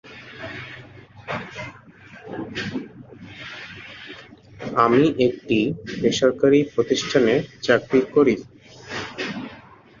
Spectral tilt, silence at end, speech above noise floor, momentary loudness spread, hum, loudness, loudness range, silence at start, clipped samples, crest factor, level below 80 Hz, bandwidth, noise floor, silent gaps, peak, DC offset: -5.5 dB/octave; 0.4 s; 27 dB; 21 LU; none; -21 LUFS; 14 LU; 0.05 s; under 0.1%; 20 dB; -56 dBFS; 7.4 kHz; -46 dBFS; none; -2 dBFS; under 0.1%